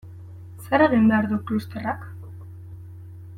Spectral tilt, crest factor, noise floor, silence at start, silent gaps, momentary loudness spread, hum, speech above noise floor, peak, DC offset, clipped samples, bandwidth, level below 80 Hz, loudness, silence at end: -8 dB/octave; 20 dB; -40 dBFS; 0.05 s; none; 24 LU; none; 20 dB; -6 dBFS; under 0.1%; under 0.1%; 14.5 kHz; -58 dBFS; -22 LUFS; 0 s